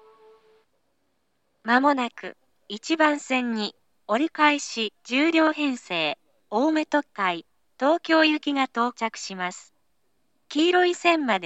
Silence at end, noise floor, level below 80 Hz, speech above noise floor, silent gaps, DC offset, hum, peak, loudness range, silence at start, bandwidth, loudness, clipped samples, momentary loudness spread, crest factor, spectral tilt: 0 s; -74 dBFS; -86 dBFS; 51 dB; none; under 0.1%; none; -4 dBFS; 2 LU; 1.65 s; 8.4 kHz; -23 LUFS; under 0.1%; 12 LU; 20 dB; -3 dB/octave